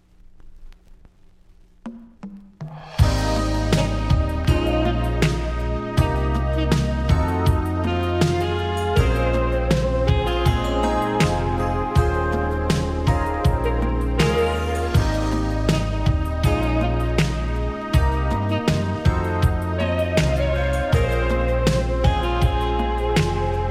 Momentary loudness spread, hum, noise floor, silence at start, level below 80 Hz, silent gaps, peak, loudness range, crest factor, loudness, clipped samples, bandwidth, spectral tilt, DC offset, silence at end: 3 LU; none; -50 dBFS; 0.4 s; -26 dBFS; none; -2 dBFS; 1 LU; 18 dB; -21 LUFS; under 0.1%; 14 kHz; -6.5 dB/octave; under 0.1%; 0 s